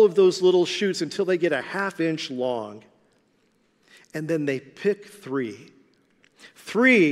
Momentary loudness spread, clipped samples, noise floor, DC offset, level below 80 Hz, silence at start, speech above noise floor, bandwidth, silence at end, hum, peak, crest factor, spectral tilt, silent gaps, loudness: 16 LU; under 0.1%; -65 dBFS; under 0.1%; -78 dBFS; 0 s; 43 dB; 12.5 kHz; 0 s; none; -6 dBFS; 18 dB; -5 dB/octave; none; -24 LUFS